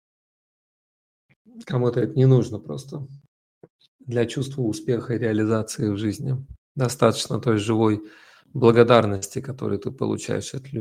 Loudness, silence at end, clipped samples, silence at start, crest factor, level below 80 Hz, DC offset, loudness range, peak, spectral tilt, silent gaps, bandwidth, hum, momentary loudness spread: -23 LUFS; 0 s; under 0.1%; 1.55 s; 22 dB; -58 dBFS; under 0.1%; 5 LU; 0 dBFS; -6.5 dB/octave; 3.28-3.61 s, 3.70-3.79 s, 3.88-3.99 s, 6.58-6.75 s; 15.5 kHz; none; 14 LU